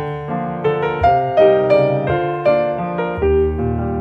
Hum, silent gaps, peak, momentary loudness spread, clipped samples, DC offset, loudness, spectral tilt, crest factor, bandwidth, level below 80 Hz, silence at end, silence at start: none; none; -2 dBFS; 8 LU; under 0.1%; under 0.1%; -16 LUFS; -9 dB/octave; 14 dB; 5.8 kHz; -32 dBFS; 0 s; 0 s